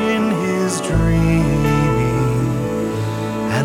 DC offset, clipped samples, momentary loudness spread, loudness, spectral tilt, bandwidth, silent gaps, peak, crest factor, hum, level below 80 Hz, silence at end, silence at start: under 0.1%; under 0.1%; 6 LU; -18 LUFS; -6.5 dB/octave; 16.5 kHz; none; -4 dBFS; 12 dB; none; -30 dBFS; 0 s; 0 s